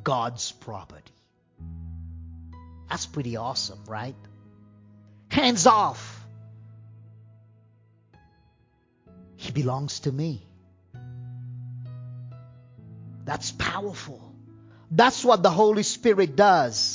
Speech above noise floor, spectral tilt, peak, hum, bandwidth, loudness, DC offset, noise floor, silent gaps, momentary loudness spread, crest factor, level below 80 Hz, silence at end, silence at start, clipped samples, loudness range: 41 dB; -4 dB/octave; -4 dBFS; none; 7.8 kHz; -23 LUFS; under 0.1%; -64 dBFS; none; 25 LU; 24 dB; -52 dBFS; 0 s; 0 s; under 0.1%; 13 LU